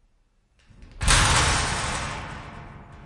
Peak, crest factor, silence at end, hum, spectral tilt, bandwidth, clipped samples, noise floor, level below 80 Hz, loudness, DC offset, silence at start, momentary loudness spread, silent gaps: -6 dBFS; 20 dB; 0 s; none; -2.5 dB/octave; 11.5 kHz; under 0.1%; -64 dBFS; -32 dBFS; -22 LUFS; under 0.1%; 0.8 s; 23 LU; none